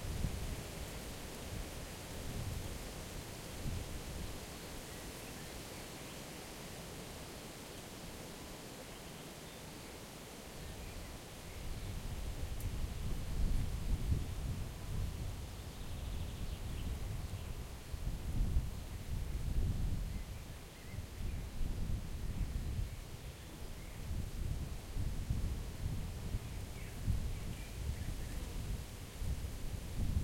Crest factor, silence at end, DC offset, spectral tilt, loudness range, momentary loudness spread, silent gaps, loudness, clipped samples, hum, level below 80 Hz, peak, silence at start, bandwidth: 20 dB; 0 s; under 0.1%; -5 dB/octave; 6 LU; 9 LU; none; -44 LUFS; under 0.1%; none; -44 dBFS; -22 dBFS; 0 s; 16.5 kHz